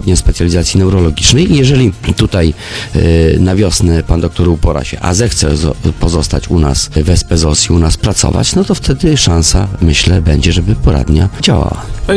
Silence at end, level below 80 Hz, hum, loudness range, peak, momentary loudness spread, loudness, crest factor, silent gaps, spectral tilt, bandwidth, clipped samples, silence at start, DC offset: 0 s; -16 dBFS; none; 2 LU; 0 dBFS; 5 LU; -10 LUFS; 10 dB; none; -5 dB/octave; 11 kHz; 0.5%; 0 s; under 0.1%